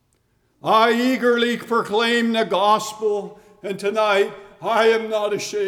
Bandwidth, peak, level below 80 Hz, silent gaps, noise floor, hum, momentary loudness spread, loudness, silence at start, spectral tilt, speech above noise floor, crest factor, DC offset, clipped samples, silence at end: 17 kHz; -6 dBFS; -68 dBFS; none; -65 dBFS; none; 11 LU; -19 LUFS; 0.65 s; -3.5 dB/octave; 45 dB; 14 dB; under 0.1%; under 0.1%; 0 s